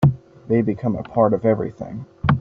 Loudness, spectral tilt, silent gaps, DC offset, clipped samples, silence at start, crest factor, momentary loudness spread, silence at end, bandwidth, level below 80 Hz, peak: -21 LUFS; -8.5 dB/octave; none; under 0.1%; under 0.1%; 0 s; 16 dB; 15 LU; 0 s; 5.2 kHz; -44 dBFS; -4 dBFS